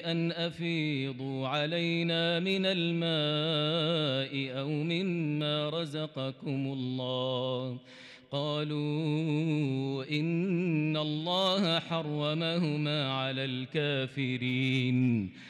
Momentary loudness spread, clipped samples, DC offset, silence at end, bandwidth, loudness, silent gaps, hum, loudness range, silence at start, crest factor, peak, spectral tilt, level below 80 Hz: 6 LU; under 0.1%; under 0.1%; 0 s; 10 kHz; -31 LUFS; none; none; 4 LU; 0 s; 12 dB; -18 dBFS; -6.5 dB/octave; -78 dBFS